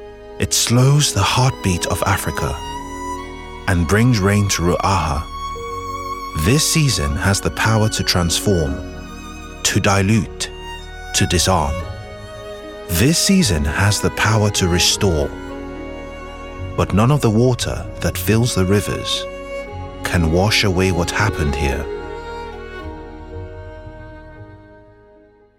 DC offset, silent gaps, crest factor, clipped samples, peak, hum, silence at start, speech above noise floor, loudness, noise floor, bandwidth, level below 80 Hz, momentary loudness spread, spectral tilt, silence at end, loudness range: under 0.1%; none; 16 dB; under 0.1%; -2 dBFS; none; 0 s; 32 dB; -17 LUFS; -49 dBFS; 18 kHz; -34 dBFS; 18 LU; -4.5 dB/octave; 0.8 s; 3 LU